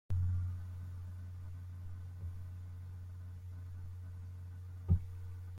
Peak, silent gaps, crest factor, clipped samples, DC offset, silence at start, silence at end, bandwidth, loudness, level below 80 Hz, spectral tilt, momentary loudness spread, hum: -18 dBFS; none; 22 dB; under 0.1%; under 0.1%; 0.1 s; 0 s; 3.6 kHz; -43 LUFS; -54 dBFS; -9 dB/octave; 13 LU; none